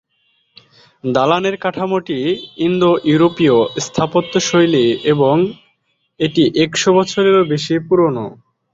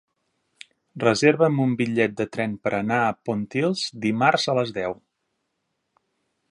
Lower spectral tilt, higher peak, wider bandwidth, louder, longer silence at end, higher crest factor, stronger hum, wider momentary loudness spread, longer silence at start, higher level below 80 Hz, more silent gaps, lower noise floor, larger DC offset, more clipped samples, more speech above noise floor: about the same, -5 dB/octave vs -5.5 dB/octave; about the same, -2 dBFS vs -2 dBFS; second, 7.8 kHz vs 11.5 kHz; first, -15 LUFS vs -23 LUFS; second, 0.4 s vs 1.55 s; second, 14 dB vs 22 dB; neither; second, 7 LU vs 10 LU; about the same, 1.05 s vs 0.95 s; first, -54 dBFS vs -64 dBFS; neither; second, -64 dBFS vs -76 dBFS; neither; neither; second, 50 dB vs 54 dB